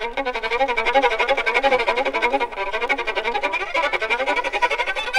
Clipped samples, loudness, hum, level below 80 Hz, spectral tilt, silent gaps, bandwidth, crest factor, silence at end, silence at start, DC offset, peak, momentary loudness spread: under 0.1%; -20 LUFS; none; -44 dBFS; -2 dB/octave; none; 13.5 kHz; 16 dB; 0 s; 0 s; under 0.1%; -4 dBFS; 5 LU